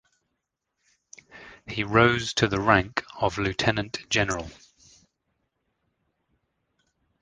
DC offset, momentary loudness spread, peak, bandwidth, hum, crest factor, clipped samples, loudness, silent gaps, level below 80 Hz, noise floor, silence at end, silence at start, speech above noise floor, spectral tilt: under 0.1%; 14 LU; -2 dBFS; 10 kHz; none; 26 dB; under 0.1%; -24 LUFS; none; -50 dBFS; -81 dBFS; 2.7 s; 1.35 s; 57 dB; -4.5 dB/octave